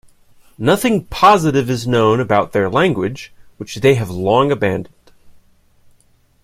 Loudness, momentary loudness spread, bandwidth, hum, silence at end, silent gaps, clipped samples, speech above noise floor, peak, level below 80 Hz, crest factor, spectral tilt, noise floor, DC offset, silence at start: -15 LUFS; 12 LU; 16 kHz; none; 1.15 s; none; under 0.1%; 39 dB; 0 dBFS; -46 dBFS; 16 dB; -6 dB/octave; -54 dBFS; under 0.1%; 0.6 s